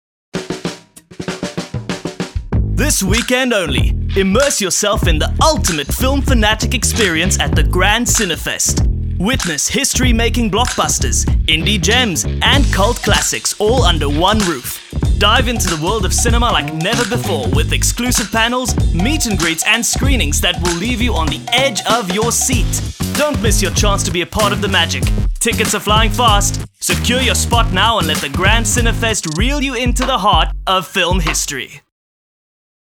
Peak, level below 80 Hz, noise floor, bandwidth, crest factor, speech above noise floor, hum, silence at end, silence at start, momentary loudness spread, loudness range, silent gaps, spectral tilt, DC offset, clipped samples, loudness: 0 dBFS; -20 dBFS; -35 dBFS; 18.5 kHz; 14 dB; 21 dB; none; 1.15 s; 0.35 s; 7 LU; 2 LU; none; -3.5 dB/octave; under 0.1%; under 0.1%; -14 LUFS